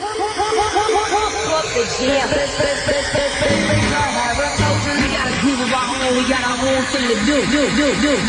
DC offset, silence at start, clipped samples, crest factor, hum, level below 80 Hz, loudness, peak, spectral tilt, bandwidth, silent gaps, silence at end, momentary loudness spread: under 0.1%; 0 s; under 0.1%; 14 dB; none; -36 dBFS; -17 LUFS; -4 dBFS; -3.5 dB/octave; 10.5 kHz; none; 0 s; 3 LU